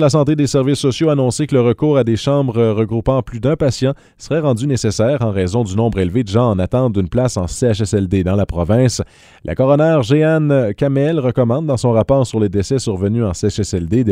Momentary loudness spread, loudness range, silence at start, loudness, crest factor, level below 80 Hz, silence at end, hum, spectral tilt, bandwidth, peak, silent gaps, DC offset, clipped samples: 5 LU; 2 LU; 0 s; -16 LUFS; 14 dB; -36 dBFS; 0 s; none; -7 dB/octave; 13 kHz; 0 dBFS; none; under 0.1%; under 0.1%